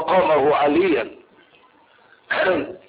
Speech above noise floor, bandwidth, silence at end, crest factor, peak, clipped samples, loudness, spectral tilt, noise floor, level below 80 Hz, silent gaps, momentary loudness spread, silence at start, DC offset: 35 dB; 5 kHz; 0.1 s; 14 dB; -6 dBFS; under 0.1%; -19 LUFS; -10 dB/octave; -54 dBFS; -58 dBFS; none; 8 LU; 0 s; under 0.1%